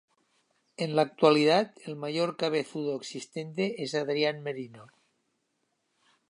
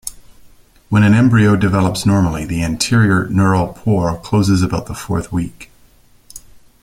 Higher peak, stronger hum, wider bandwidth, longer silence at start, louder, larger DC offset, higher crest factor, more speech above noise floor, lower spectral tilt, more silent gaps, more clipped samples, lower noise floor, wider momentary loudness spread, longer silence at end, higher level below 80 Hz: second, -8 dBFS vs -2 dBFS; neither; second, 11 kHz vs 16 kHz; first, 0.8 s vs 0.05 s; second, -29 LUFS vs -15 LUFS; neither; first, 22 dB vs 14 dB; first, 49 dB vs 35 dB; about the same, -5 dB/octave vs -6 dB/octave; neither; neither; first, -77 dBFS vs -48 dBFS; first, 15 LU vs 11 LU; first, 1.45 s vs 0.45 s; second, -84 dBFS vs -38 dBFS